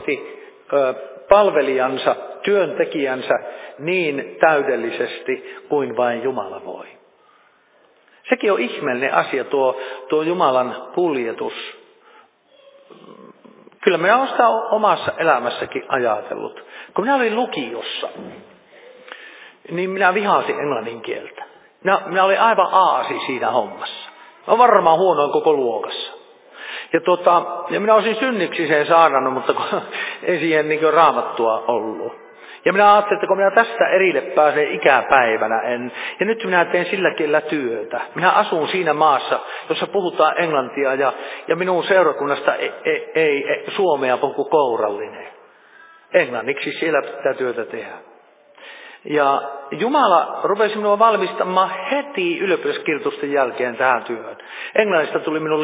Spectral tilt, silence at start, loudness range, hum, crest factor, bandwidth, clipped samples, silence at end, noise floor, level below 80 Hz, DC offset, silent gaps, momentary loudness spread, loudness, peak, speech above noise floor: -8.5 dB/octave; 0 s; 6 LU; none; 18 dB; 4 kHz; under 0.1%; 0 s; -55 dBFS; -64 dBFS; under 0.1%; none; 14 LU; -18 LUFS; 0 dBFS; 37 dB